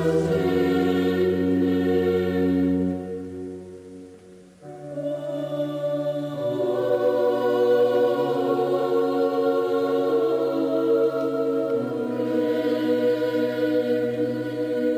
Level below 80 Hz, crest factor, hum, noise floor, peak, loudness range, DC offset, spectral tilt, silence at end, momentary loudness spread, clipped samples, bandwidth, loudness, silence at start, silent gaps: -58 dBFS; 10 dB; none; -47 dBFS; -12 dBFS; 7 LU; under 0.1%; -7.5 dB/octave; 0 s; 9 LU; under 0.1%; 15.5 kHz; -23 LUFS; 0 s; none